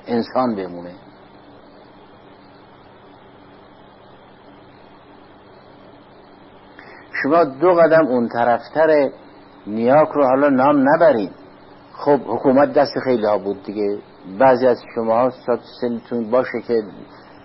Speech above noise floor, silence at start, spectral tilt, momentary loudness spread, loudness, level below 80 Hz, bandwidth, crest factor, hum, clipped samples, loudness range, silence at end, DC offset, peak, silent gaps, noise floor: 28 dB; 0.05 s; -11 dB/octave; 13 LU; -17 LUFS; -62 dBFS; 5.8 kHz; 16 dB; none; under 0.1%; 9 LU; 0.4 s; under 0.1%; -4 dBFS; none; -45 dBFS